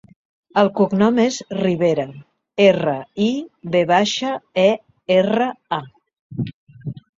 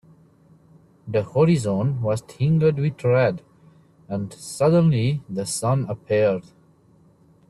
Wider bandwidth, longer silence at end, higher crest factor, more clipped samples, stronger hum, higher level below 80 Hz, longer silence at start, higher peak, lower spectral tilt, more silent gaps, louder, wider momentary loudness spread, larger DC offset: second, 7.8 kHz vs 12.5 kHz; second, 0.2 s vs 1.1 s; about the same, 18 dB vs 16 dB; neither; neither; about the same, -58 dBFS vs -58 dBFS; second, 0.55 s vs 1.05 s; first, -2 dBFS vs -8 dBFS; second, -5.5 dB/octave vs -7 dB/octave; first, 6.19-6.30 s, 6.54-6.67 s vs none; first, -19 LUFS vs -22 LUFS; about the same, 14 LU vs 12 LU; neither